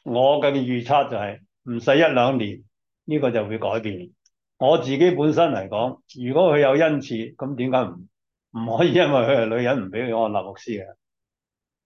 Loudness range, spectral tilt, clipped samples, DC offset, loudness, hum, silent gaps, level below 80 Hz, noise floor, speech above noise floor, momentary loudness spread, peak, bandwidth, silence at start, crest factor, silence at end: 3 LU; -7 dB/octave; under 0.1%; under 0.1%; -21 LUFS; none; none; -62 dBFS; -89 dBFS; 68 dB; 15 LU; -6 dBFS; 7 kHz; 0.05 s; 16 dB; 0.95 s